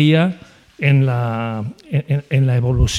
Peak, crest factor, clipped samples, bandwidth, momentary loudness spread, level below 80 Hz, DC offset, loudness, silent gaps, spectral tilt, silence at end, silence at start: -2 dBFS; 14 dB; under 0.1%; 11.5 kHz; 9 LU; -30 dBFS; under 0.1%; -18 LUFS; none; -6.5 dB/octave; 0 s; 0 s